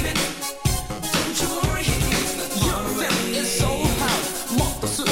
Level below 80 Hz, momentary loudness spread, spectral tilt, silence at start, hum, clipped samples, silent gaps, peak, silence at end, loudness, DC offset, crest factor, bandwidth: -32 dBFS; 3 LU; -3.5 dB/octave; 0 s; none; under 0.1%; none; -6 dBFS; 0 s; -22 LUFS; under 0.1%; 16 dB; 17 kHz